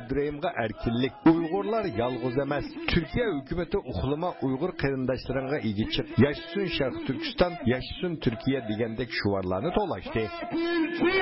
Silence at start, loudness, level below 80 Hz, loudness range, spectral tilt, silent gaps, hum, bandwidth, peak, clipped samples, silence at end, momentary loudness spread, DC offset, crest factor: 0 s; -28 LUFS; -44 dBFS; 2 LU; -10.5 dB/octave; none; none; 5.8 kHz; -12 dBFS; under 0.1%; 0 s; 6 LU; under 0.1%; 16 dB